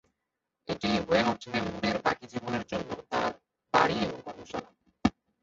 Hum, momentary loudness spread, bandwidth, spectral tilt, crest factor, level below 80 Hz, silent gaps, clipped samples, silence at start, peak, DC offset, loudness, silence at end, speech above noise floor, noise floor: none; 14 LU; 7.8 kHz; -5 dB/octave; 22 dB; -56 dBFS; none; under 0.1%; 0.7 s; -8 dBFS; under 0.1%; -30 LUFS; 0.35 s; 56 dB; -85 dBFS